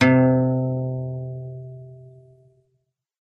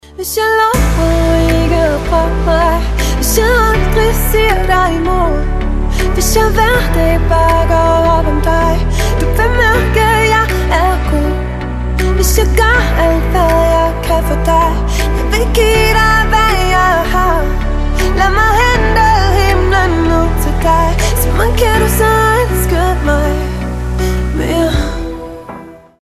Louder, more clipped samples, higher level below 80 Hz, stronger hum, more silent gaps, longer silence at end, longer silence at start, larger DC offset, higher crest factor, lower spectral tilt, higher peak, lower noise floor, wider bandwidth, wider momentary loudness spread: second, -22 LUFS vs -12 LUFS; neither; second, -58 dBFS vs -14 dBFS; neither; neither; first, 1.15 s vs 0.3 s; second, 0 s vs 0.15 s; neither; first, 20 dB vs 10 dB; first, -8 dB/octave vs -5 dB/octave; about the same, -2 dBFS vs 0 dBFS; first, -73 dBFS vs -31 dBFS; second, 6.4 kHz vs 14.5 kHz; first, 23 LU vs 7 LU